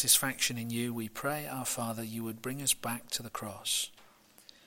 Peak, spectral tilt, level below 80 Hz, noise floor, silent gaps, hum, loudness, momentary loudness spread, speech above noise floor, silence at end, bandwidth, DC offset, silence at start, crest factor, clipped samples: -10 dBFS; -2 dB/octave; -66 dBFS; -60 dBFS; none; none; -33 LUFS; 9 LU; 26 dB; 0.25 s; 16.5 kHz; under 0.1%; 0 s; 24 dB; under 0.1%